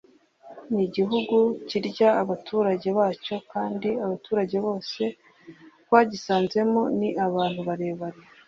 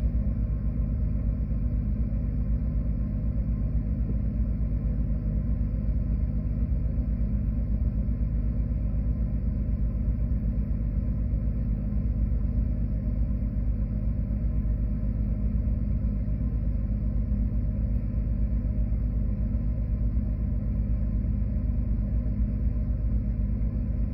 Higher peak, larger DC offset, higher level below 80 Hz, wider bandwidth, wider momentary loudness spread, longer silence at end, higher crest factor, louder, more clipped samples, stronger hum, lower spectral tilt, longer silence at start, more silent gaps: first, -4 dBFS vs -14 dBFS; neither; second, -68 dBFS vs -28 dBFS; first, 7.6 kHz vs 2.5 kHz; first, 9 LU vs 1 LU; first, 0.35 s vs 0 s; first, 22 dB vs 12 dB; first, -25 LUFS vs -29 LUFS; neither; second, none vs 60 Hz at -35 dBFS; second, -6.5 dB/octave vs -13 dB/octave; first, 0.45 s vs 0 s; neither